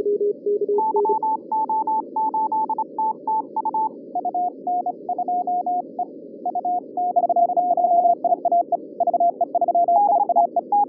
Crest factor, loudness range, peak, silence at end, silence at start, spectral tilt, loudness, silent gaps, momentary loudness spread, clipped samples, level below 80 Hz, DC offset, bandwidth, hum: 14 dB; 6 LU; -6 dBFS; 0 s; 0 s; -12.5 dB/octave; -22 LUFS; none; 8 LU; under 0.1%; -88 dBFS; under 0.1%; 1.2 kHz; none